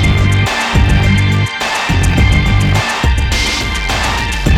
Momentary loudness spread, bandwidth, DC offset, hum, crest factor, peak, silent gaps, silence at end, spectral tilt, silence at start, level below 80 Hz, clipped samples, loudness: 4 LU; 15.5 kHz; under 0.1%; none; 12 dB; 0 dBFS; none; 0 s; -4.5 dB/octave; 0 s; -18 dBFS; under 0.1%; -13 LUFS